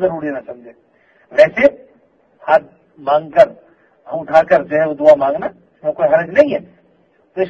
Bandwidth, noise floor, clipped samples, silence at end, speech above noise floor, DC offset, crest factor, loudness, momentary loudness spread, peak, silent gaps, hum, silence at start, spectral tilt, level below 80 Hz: 7.4 kHz; -55 dBFS; 0.3%; 0 s; 41 dB; under 0.1%; 16 dB; -14 LUFS; 16 LU; 0 dBFS; none; none; 0 s; -6.5 dB/octave; -56 dBFS